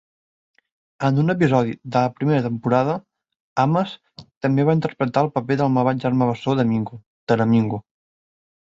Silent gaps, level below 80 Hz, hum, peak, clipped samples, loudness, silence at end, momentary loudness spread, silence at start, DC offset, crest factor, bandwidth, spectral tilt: 3.36-3.56 s, 4.37-4.41 s, 7.06-7.27 s; -58 dBFS; none; -4 dBFS; under 0.1%; -21 LUFS; 0.85 s; 9 LU; 1 s; under 0.1%; 18 dB; 7.8 kHz; -8.5 dB/octave